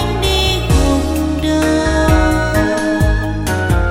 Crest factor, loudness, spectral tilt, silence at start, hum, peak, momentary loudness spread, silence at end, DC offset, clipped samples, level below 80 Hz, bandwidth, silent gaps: 14 dB; -15 LUFS; -5.5 dB/octave; 0 s; none; 0 dBFS; 4 LU; 0 s; under 0.1%; under 0.1%; -18 dBFS; 16.5 kHz; none